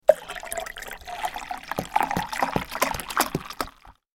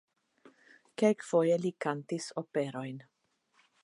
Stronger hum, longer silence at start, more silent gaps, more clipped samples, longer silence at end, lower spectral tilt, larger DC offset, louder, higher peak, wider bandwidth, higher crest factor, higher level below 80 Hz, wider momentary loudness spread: neither; second, 0.1 s vs 1 s; neither; neither; second, 0.25 s vs 0.85 s; second, -3.5 dB/octave vs -6 dB/octave; neither; first, -28 LUFS vs -32 LUFS; first, 0 dBFS vs -14 dBFS; first, 17 kHz vs 11.5 kHz; first, 26 dB vs 20 dB; first, -48 dBFS vs -86 dBFS; second, 10 LU vs 15 LU